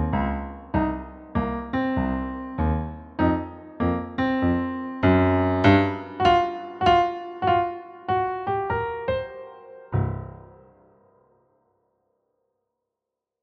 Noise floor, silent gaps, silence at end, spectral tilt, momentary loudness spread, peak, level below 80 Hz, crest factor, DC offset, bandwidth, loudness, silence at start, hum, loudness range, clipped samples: -86 dBFS; none; 2.95 s; -8 dB/octave; 13 LU; -4 dBFS; -40 dBFS; 22 dB; under 0.1%; 7.2 kHz; -24 LUFS; 0 s; none; 13 LU; under 0.1%